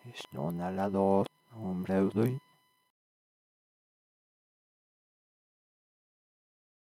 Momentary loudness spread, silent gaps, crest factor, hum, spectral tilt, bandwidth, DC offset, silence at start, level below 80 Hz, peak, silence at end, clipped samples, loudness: 13 LU; none; 22 dB; none; -8 dB/octave; 15 kHz; under 0.1%; 0.05 s; -76 dBFS; -14 dBFS; 4.6 s; under 0.1%; -32 LUFS